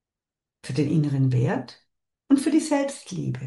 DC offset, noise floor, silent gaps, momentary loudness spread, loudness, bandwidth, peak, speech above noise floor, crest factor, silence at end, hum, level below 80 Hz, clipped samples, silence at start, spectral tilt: under 0.1%; -89 dBFS; none; 10 LU; -24 LUFS; 11.5 kHz; -8 dBFS; 66 dB; 18 dB; 0 s; none; -64 dBFS; under 0.1%; 0.65 s; -7 dB/octave